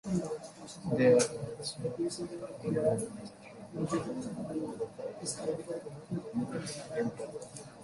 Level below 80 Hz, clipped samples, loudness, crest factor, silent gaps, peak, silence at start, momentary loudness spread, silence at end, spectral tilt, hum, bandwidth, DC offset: -66 dBFS; under 0.1%; -35 LUFS; 20 dB; none; -14 dBFS; 0.05 s; 15 LU; 0 s; -5.5 dB/octave; none; 11.5 kHz; under 0.1%